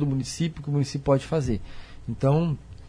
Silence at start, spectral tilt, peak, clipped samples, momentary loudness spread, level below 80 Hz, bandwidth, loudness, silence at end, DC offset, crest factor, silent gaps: 0 s; -7 dB/octave; -8 dBFS; under 0.1%; 12 LU; -44 dBFS; 10.5 kHz; -26 LUFS; 0 s; under 0.1%; 18 dB; none